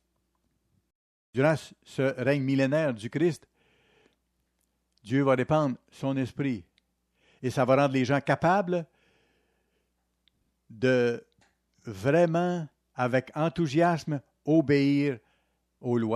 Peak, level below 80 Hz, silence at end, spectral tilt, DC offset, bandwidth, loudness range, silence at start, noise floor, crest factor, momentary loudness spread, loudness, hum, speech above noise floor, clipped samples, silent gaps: -10 dBFS; -66 dBFS; 0 s; -7 dB/octave; under 0.1%; 12.5 kHz; 3 LU; 1.35 s; -76 dBFS; 18 dB; 12 LU; -27 LUFS; none; 50 dB; under 0.1%; none